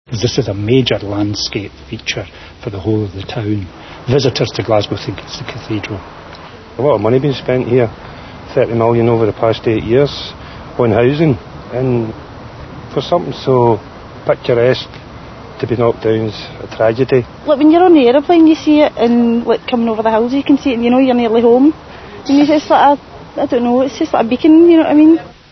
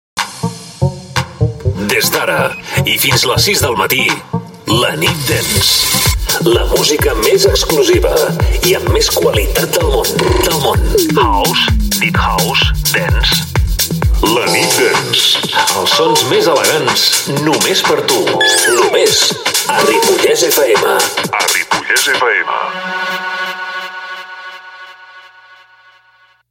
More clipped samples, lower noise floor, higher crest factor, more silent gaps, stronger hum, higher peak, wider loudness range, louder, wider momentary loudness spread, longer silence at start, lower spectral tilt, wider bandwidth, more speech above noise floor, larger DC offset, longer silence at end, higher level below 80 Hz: neither; second, -33 dBFS vs -50 dBFS; about the same, 12 dB vs 12 dB; neither; neither; about the same, 0 dBFS vs 0 dBFS; first, 7 LU vs 4 LU; about the same, -13 LUFS vs -11 LUFS; first, 19 LU vs 9 LU; about the same, 0.1 s vs 0.15 s; first, -7 dB/octave vs -3 dB/octave; second, 6.4 kHz vs 17 kHz; second, 21 dB vs 38 dB; neither; second, 0.2 s vs 1.3 s; second, -42 dBFS vs -24 dBFS